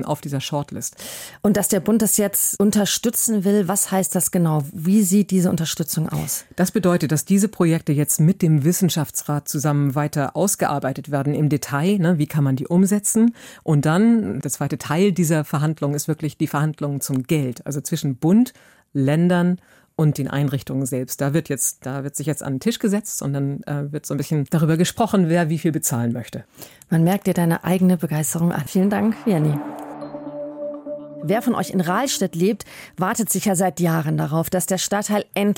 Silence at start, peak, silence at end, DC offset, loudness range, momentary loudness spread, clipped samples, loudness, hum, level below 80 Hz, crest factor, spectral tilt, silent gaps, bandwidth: 0 s; -6 dBFS; 0.05 s; under 0.1%; 5 LU; 9 LU; under 0.1%; -20 LUFS; none; -58 dBFS; 14 dB; -5.5 dB/octave; none; 17 kHz